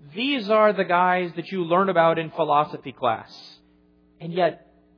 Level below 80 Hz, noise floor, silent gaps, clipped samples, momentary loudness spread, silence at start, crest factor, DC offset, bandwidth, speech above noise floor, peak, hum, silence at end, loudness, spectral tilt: -70 dBFS; -58 dBFS; none; under 0.1%; 11 LU; 0.05 s; 18 dB; under 0.1%; 5.4 kHz; 36 dB; -6 dBFS; none; 0.4 s; -22 LUFS; -7.5 dB/octave